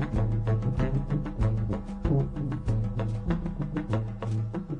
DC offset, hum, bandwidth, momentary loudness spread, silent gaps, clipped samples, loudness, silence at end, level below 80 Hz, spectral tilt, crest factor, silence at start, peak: under 0.1%; none; 7 kHz; 4 LU; none; under 0.1%; -30 LUFS; 0 s; -36 dBFS; -9.5 dB/octave; 14 dB; 0 s; -14 dBFS